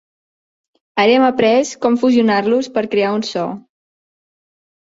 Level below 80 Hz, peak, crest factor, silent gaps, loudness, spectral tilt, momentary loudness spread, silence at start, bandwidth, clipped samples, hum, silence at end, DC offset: -62 dBFS; -2 dBFS; 16 dB; none; -15 LUFS; -4.5 dB/octave; 11 LU; 0.95 s; 8 kHz; under 0.1%; none; 1.25 s; under 0.1%